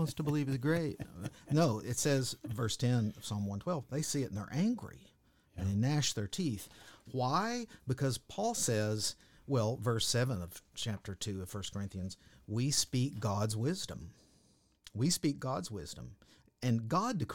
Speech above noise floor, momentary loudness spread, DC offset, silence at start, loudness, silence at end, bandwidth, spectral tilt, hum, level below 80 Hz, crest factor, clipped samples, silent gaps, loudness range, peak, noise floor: 34 dB; 13 LU; under 0.1%; 0 s; -35 LUFS; 0 s; 18 kHz; -5 dB/octave; none; -62 dBFS; 18 dB; under 0.1%; none; 3 LU; -16 dBFS; -69 dBFS